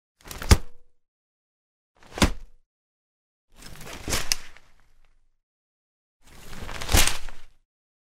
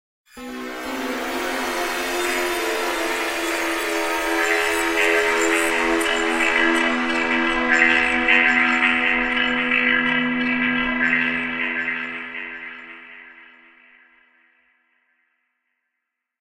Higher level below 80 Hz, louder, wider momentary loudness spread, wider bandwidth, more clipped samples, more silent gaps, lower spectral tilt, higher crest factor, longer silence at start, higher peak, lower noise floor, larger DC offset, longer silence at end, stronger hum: first, -32 dBFS vs -48 dBFS; second, -24 LUFS vs -19 LUFS; first, 23 LU vs 14 LU; about the same, 16 kHz vs 16 kHz; neither; first, 1.08-1.95 s, 2.66-3.48 s, 5.43-6.20 s vs none; about the same, -3 dB/octave vs -2 dB/octave; first, 26 dB vs 20 dB; about the same, 0.25 s vs 0.35 s; about the same, -2 dBFS vs -2 dBFS; second, -56 dBFS vs -80 dBFS; neither; second, 0.7 s vs 2.95 s; neither